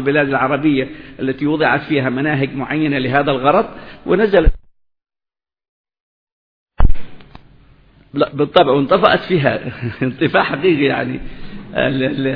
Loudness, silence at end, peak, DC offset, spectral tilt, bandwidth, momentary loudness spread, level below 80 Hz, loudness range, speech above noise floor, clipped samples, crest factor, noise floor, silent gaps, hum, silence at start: -16 LUFS; 0 s; 0 dBFS; under 0.1%; -9.5 dB/octave; 5 kHz; 13 LU; -26 dBFS; 11 LU; over 75 dB; under 0.1%; 16 dB; under -90 dBFS; 5.69-5.84 s, 6.00-6.66 s; none; 0 s